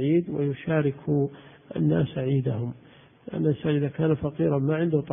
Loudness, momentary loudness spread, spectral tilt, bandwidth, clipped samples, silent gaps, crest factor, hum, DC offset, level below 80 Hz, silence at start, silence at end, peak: -26 LUFS; 10 LU; -12.5 dB/octave; 3.7 kHz; under 0.1%; none; 16 dB; none; under 0.1%; -54 dBFS; 0 s; 0 s; -10 dBFS